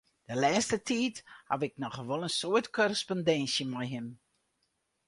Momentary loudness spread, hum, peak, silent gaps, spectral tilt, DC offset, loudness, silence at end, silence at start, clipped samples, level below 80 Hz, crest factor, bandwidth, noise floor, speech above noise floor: 11 LU; none; -14 dBFS; none; -4 dB/octave; under 0.1%; -31 LUFS; 0.9 s; 0.3 s; under 0.1%; -70 dBFS; 18 dB; 11.5 kHz; -79 dBFS; 47 dB